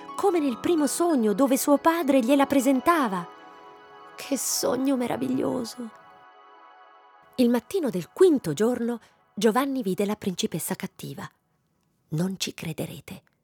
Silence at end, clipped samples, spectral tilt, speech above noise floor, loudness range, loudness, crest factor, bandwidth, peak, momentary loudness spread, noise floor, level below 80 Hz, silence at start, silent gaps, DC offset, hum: 0.25 s; under 0.1%; -4.5 dB/octave; 46 dB; 7 LU; -25 LUFS; 18 dB; 20 kHz; -8 dBFS; 17 LU; -70 dBFS; -68 dBFS; 0 s; none; under 0.1%; none